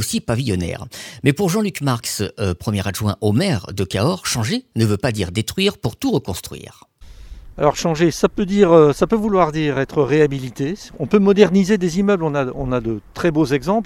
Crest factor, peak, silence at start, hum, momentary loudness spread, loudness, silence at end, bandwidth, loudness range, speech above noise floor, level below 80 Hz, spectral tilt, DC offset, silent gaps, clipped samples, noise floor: 18 dB; 0 dBFS; 0 s; none; 10 LU; -18 LUFS; 0 s; 18.5 kHz; 5 LU; 20 dB; -42 dBFS; -5.5 dB/octave; under 0.1%; none; under 0.1%; -38 dBFS